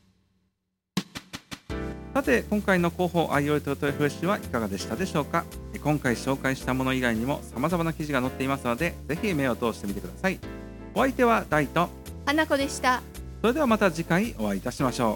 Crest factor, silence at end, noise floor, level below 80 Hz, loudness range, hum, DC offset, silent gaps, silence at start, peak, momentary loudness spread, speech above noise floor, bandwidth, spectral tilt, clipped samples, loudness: 20 dB; 0 s; -78 dBFS; -44 dBFS; 3 LU; none; under 0.1%; none; 0.95 s; -8 dBFS; 11 LU; 52 dB; 17.5 kHz; -5.5 dB/octave; under 0.1%; -27 LUFS